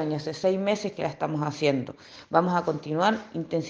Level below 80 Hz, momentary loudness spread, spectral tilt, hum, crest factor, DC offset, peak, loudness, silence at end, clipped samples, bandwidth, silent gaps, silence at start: -68 dBFS; 7 LU; -6 dB/octave; none; 22 dB; under 0.1%; -6 dBFS; -27 LUFS; 0 s; under 0.1%; 9.6 kHz; none; 0 s